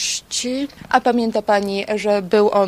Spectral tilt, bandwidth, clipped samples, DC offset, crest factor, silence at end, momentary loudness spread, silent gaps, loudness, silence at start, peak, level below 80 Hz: -3.5 dB/octave; 15 kHz; under 0.1%; under 0.1%; 18 dB; 0 s; 6 LU; none; -19 LUFS; 0 s; 0 dBFS; -54 dBFS